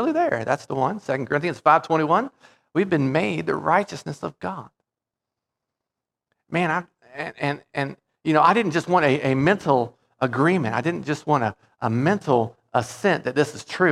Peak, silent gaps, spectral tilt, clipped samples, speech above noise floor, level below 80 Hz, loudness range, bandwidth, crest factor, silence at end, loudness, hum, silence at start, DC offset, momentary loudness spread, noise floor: -2 dBFS; none; -6.5 dB/octave; under 0.1%; 65 dB; -64 dBFS; 9 LU; 13 kHz; 20 dB; 0 s; -22 LUFS; none; 0 s; under 0.1%; 12 LU; -87 dBFS